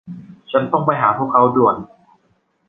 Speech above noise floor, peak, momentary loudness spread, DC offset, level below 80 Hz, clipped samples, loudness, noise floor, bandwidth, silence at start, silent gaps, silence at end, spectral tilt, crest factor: 47 dB; -2 dBFS; 16 LU; under 0.1%; -58 dBFS; under 0.1%; -16 LUFS; -62 dBFS; 4 kHz; 0.05 s; none; 0.85 s; -10 dB/octave; 18 dB